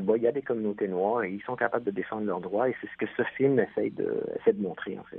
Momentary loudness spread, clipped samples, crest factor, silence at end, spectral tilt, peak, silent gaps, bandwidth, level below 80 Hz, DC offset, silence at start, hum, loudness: 7 LU; under 0.1%; 18 dB; 0 s; -10.5 dB/octave; -10 dBFS; none; 3.9 kHz; -70 dBFS; under 0.1%; 0 s; none; -29 LUFS